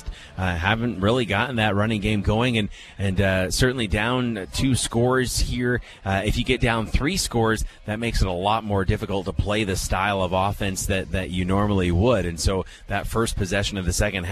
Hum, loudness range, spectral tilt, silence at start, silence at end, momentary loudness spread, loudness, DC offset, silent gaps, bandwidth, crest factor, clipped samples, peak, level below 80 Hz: none; 2 LU; -5 dB/octave; 0 s; 0 s; 6 LU; -23 LUFS; under 0.1%; none; 14 kHz; 18 dB; under 0.1%; -4 dBFS; -32 dBFS